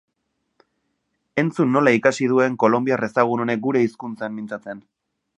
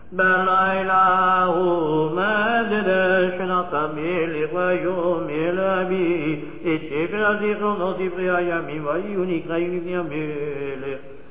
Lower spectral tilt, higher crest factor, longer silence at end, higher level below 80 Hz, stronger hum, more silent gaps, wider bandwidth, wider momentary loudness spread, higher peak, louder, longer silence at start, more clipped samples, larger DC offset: second, -6.5 dB/octave vs -9.5 dB/octave; first, 20 dB vs 14 dB; first, 0.6 s vs 0.1 s; second, -68 dBFS vs -54 dBFS; neither; neither; first, 10.5 kHz vs 4 kHz; first, 14 LU vs 10 LU; first, -2 dBFS vs -6 dBFS; about the same, -20 LUFS vs -21 LUFS; first, 1.35 s vs 0.1 s; neither; second, under 0.1% vs 1%